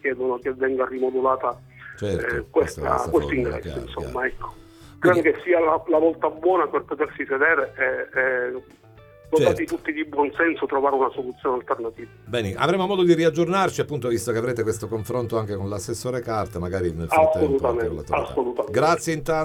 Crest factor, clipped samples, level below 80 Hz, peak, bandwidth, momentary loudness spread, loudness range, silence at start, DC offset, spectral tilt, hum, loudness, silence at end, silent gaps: 18 dB; under 0.1%; -46 dBFS; -4 dBFS; 16.5 kHz; 9 LU; 4 LU; 0.05 s; under 0.1%; -5.5 dB/octave; none; -23 LUFS; 0 s; none